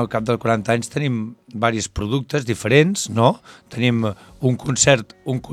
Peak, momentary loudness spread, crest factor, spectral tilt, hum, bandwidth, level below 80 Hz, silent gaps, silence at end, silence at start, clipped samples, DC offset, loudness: 0 dBFS; 11 LU; 20 dB; -4.5 dB/octave; none; 14 kHz; -48 dBFS; none; 0 s; 0 s; under 0.1%; under 0.1%; -20 LUFS